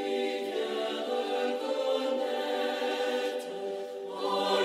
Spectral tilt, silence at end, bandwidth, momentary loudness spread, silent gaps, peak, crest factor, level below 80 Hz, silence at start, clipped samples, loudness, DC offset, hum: -3 dB/octave; 0 s; 15 kHz; 7 LU; none; -16 dBFS; 16 dB; -84 dBFS; 0 s; under 0.1%; -32 LUFS; under 0.1%; none